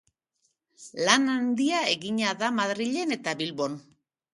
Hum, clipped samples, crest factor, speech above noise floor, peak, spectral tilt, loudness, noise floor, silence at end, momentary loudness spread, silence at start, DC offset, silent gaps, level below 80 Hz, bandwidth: none; under 0.1%; 26 dB; 48 dB; -2 dBFS; -3 dB/octave; -26 LUFS; -75 dBFS; 0.55 s; 10 LU; 0.8 s; under 0.1%; none; -76 dBFS; 11.5 kHz